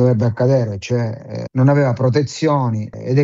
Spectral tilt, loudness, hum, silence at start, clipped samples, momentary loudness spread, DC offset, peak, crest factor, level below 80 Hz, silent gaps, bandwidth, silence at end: -7.5 dB/octave; -17 LUFS; none; 0 s; under 0.1%; 10 LU; under 0.1%; -2 dBFS; 14 dB; -54 dBFS; none; 7.6 kHz; 0 s